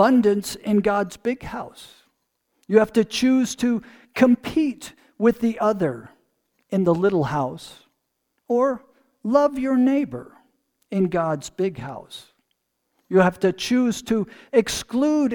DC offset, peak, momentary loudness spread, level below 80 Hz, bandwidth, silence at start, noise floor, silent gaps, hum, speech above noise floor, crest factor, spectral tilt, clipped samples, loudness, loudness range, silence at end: under 0.1%; -4 dBFS; 16 LU; -54 dBFS; 19 kHz; 0 s; -74 dBFS; none; none; 54 dB; 20 dB; -5.5 dB/octave; under 0.1%; -22 LUFS; 4 LU; 0 s